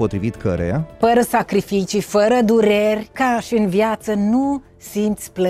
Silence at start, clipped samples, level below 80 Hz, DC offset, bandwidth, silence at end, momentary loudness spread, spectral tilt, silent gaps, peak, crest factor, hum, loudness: 0 s; under 0.1%; -46 dBFS; under 0.1%; 15.5 kHz; 0 s; 8 LU; -6 dB/octave; none; -4 dBFS; 14 dB; none; -18 LUFS